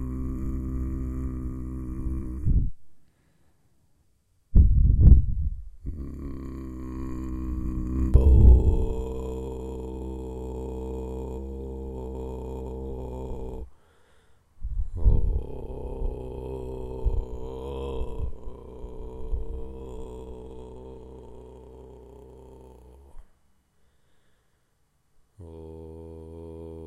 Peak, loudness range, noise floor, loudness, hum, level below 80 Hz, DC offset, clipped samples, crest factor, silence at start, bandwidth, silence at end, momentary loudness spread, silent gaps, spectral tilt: -2 dBFS; 20 LU; -69 dBFS; -28 LUFS; none; -28 dBFS; under 0.1%; under 0.1%; 24 dB; 0 s; 3.5 kHz; 0 s; 23 LU; none; -10 dB/octave